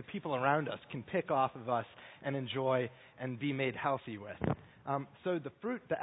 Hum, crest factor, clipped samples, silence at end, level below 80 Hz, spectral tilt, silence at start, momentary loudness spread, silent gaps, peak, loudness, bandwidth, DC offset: none; 22 dB; under 0.1%; 0 s; -64 dBFS; -3 dB/octave; 0 s; 11 LU; none; -16 dBFS; -36 LUFS; 3.9 kHz; under 0.1%